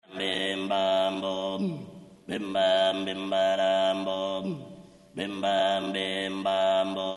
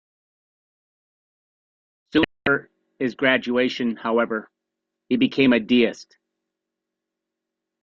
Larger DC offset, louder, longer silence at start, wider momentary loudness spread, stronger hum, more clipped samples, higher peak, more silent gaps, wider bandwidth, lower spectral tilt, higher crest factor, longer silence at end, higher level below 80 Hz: neither; second, -27 LUFS vs -21 LUFS; second, 0.1 s vs 2.15 s; first, 12 LU vs 9 LU; neither; neither; second, -14 dBFS vs -4 dBFS; neither; first, 11.5 kHz vs 7.2 kHz; second, -4.5 dB/octave vs -6 dB/octave; second, 14 dB vs 22 dB; second, 0 s vs 1.8 s; second, -70 dBFS vs -60 dBFS